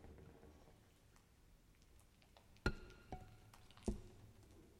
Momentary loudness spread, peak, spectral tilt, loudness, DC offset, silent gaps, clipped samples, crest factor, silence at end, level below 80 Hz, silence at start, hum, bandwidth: 23 LU; -24 dBFS; -5.5 dB/octave; -51 LUFS; under 0.1%; none; under 0.1%; 28 dB; 0 s; -58 dBFS; 0 s; none; 16.5 kHz